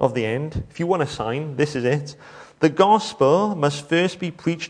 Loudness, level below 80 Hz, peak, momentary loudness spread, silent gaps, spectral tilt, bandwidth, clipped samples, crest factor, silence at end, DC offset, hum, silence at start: -21 LUFS; -50 dBFS; -2 dBFS; 10 LU; none; -6 dB/octave; 10.5 kHz; under 0.1%; 18 dB; 0 s; under 0.1%; none; 0 s